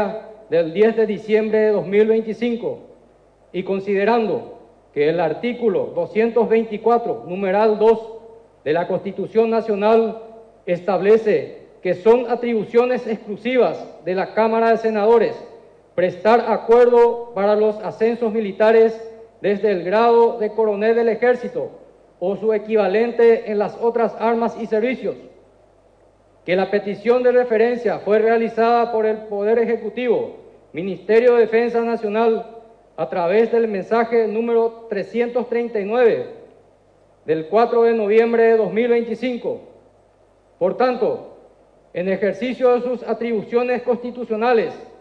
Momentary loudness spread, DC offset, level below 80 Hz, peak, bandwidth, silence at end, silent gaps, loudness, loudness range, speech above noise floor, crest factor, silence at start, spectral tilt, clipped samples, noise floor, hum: 11 LU; under 0.1%; -60 dBFS; -4 dBFS; 6.2 kHz; 0.15 s; none; -18 LUFS; 5 LU; 37 dB; 16 dB; 0 s; -7.5 dB/octave; under 0.1%; -55 dBFS; none